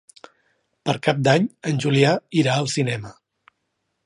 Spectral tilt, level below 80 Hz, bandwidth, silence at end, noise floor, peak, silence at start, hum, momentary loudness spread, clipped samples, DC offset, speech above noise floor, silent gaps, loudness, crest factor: -5.5 dB/octave; -62 dBFS; 11.5 kHz; 0.95 s; -75 dBFS; -2 dBFS; 0.85 s; none; 10 LU; under 0.1%; under 0.1%; 55 dB; none; -21 LUFS; 20 dB